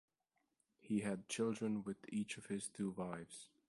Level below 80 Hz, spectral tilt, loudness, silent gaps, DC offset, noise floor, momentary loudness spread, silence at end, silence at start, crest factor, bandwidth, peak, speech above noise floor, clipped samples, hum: -78 dBFS; -5 dB/octave; -43 LUFS; none; under 0.1%; -86 dBFS; 7 LU; 0.2 s; 0.85 s; 16 dB; 11.5 kHz; -28 dBFS; 43 dB; under 0.1%; none